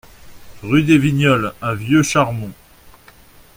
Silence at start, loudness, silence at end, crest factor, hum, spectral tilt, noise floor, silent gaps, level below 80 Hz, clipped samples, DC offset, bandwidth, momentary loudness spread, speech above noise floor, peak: 0.25 s; -16 LUFS; 0.65 s; 18 dB; none; -5.5 dB/octave; -45 dBFS; none; -46 dBFS; under 0.1%; under 0.1%; 16.5 kHz; 15 LU; 30 dB; 0 dBFS